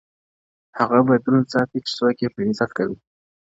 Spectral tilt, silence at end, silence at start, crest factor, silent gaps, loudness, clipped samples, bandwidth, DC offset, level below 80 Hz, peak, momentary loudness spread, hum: -7 dB/octave; 0.55 s; 0.75 s; 20 dB; none; -20 LUFS; under 0.1%; 7.8 kHz; under 0.1%; -60 dBFS; -2 dBFS; 10 LU; none